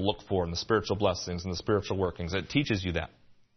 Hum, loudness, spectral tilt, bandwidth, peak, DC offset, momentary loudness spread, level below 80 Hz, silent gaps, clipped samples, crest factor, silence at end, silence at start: none; -30 LUFS; -5.5 dB/octave; 6.4 kHz; -10 dBFS; under 0.1%; 6 LU; -52 dBFS; none; under 0.1%; 20 dB; 0.25 s; 0 s